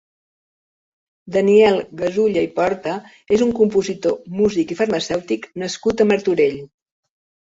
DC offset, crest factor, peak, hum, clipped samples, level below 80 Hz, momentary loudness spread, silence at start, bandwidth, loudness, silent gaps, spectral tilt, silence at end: under 0.1%; 18 dB; -2 dBFS; none; under 0.1%; -54 dBFS; 10 LU; 1.25 s; 8 kHz; -18 LUFS; none; -5.5 dB/octave; 0.8 s